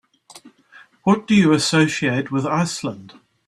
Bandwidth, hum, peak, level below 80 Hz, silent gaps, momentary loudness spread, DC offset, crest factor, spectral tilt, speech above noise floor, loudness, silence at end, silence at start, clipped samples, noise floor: 12.5 kHz; none; -2 dBFS; -58 dBFS; none; 12 LU; under 0.1%; 18 dB; -5 dB/octave; 31 dB; -18 LUFS; 0.4 s; 0.35 s; under 0.1%; -49 dBFS